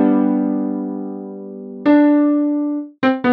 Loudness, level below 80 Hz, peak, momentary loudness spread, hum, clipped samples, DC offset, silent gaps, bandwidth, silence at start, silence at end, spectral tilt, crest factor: -17 LUFS; -66 dBFS; -2 dBFS; 17 LU; none; under 0.1%; under 0.1%; none; 4.7 kHz; 0 s; 0 s; -9.5 dB/octave; 14 dB